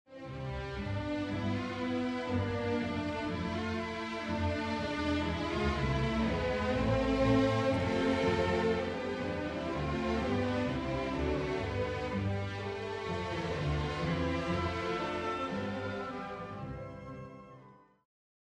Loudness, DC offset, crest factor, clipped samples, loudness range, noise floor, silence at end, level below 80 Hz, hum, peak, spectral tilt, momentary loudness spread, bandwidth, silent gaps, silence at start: -34 LUFS; under 0.1%; 18 dB; under 0.1%; 5 LU; -58 dBFS; 0.8 s; -46 dBFS; none; -16 dBFS; -6.5 dB/octave; 10 LU; 11 kHz; none; 0.1 s